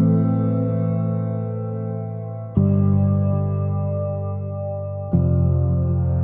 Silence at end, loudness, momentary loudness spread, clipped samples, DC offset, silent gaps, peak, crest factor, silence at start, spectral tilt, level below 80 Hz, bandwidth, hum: 0 s; -22 LUFS; 10 LU; under 0.1%; under 0.1%; none; -4 dBFS; 16 dB; 0 s; -15 dB/octave; -44 dBFS; 2.8 kHz; none